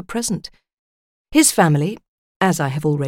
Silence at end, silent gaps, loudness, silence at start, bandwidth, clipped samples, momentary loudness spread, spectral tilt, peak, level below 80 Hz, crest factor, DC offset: 0 s; 0.73-1.25 s, 2.08-2.40 s; -18 LUFS; 0.1 s; 17 kHz; under 0.1%; 14 LU; -4.5 dB/octave; -2 dBFS; -50 dBFS; 18 dB; under 0.1%